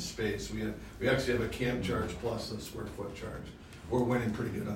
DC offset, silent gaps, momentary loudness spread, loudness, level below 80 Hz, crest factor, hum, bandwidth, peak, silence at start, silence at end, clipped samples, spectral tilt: under 0.1%; none; 12 LU; -34 LUFS; -50 dBFS; 18 dB; none; 16 kHz; -16 dBFS; 0 s; 0 s; under 0.1%; -5.5 dB/octave